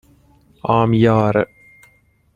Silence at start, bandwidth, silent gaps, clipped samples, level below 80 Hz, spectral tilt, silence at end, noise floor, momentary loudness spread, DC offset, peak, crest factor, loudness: 0.65 s; 7.2 kHz; none; under 0.1%; -48 dBFS; -9 dB/octave; 0.9 s; -56 dBFS; 13 LU; under 0.1%; -2 dBFS; 18 dB; -17 LUFS